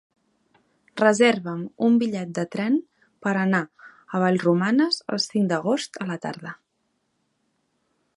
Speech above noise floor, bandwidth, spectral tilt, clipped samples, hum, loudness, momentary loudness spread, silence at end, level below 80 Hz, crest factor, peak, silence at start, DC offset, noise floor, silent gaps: 51 dB; 11.5 kHz; -5.5 dB/octave; under 0.1%; none; -23 LUFS; 12 LU; 1.6 s; -74 dBFS; 20 dB; -4 dBFS; 0.95 s; under 0.1%; -73 dBFS; none